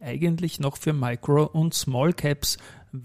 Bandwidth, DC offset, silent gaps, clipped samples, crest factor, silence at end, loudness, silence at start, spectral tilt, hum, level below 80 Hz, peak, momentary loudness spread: 15.5 kHz; 0.2%; none; under 0.1%; 14 dB; 0 s; -25 LUFS; 0 s; -5.5 dB/octave; none; -50 dBFS; -10 dBFS; 5 LU